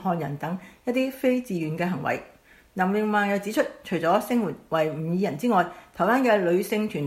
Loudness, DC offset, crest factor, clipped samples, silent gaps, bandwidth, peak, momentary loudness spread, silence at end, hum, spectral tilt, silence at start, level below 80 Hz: -25 LUFS; under 0.1%; 18 dB; under 0.1%; none; 16 kHz; -8 dBFS; 8 LU; 0 s; none; -6.5 dB/octave; 0 s; -62 dBFS